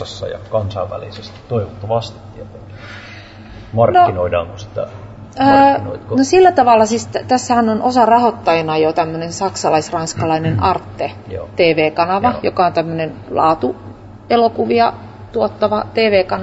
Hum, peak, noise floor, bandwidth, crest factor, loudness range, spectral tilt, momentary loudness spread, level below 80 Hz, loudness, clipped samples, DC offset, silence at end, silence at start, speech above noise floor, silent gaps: none; -2 dBFS; -35 dBFS; 8 kHz; 14 dB; 6 LU; -5.5 dB/octave; 21 LU; -46 dBFS; -15 LUFS; under 0.1%; under 0.1%; 0 s; 0 s; 20 dB; none